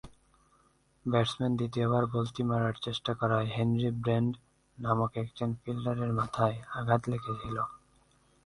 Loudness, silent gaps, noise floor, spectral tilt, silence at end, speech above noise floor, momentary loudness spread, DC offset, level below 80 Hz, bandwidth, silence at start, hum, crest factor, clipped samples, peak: -31 LUFS; none; -67 dBFS; -7.5 dB/octave; 0.7 s; 37 dB; 7 LU; under 0.1%; -58 dBFS; 11.5 kHz; 0.05 s; none; 22 dB; under 0.1%; -10 dBFS